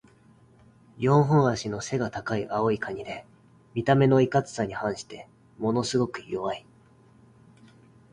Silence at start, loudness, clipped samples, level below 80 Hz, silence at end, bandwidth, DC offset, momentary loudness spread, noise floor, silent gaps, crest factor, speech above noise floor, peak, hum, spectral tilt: 1 s; -26 LUFS; under 0.1%; -58 dBFS; 1.55 s; 10.5 kHz; under 0.1%; 16 LU; -57 dBFS; none; 20 dB; 32 dB; -8 dBFS; none; -6.5 dB/octave